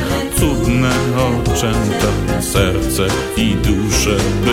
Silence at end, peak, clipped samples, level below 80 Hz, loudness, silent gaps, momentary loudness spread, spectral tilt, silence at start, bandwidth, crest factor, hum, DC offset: 0 s; -2 dBFS; under 0.1%; -24 dBFS; -16 LUFS; none; 2 LU; -5 dB/octave; 0 s; 16.5 kHz; 14 dB; none; under 0.1%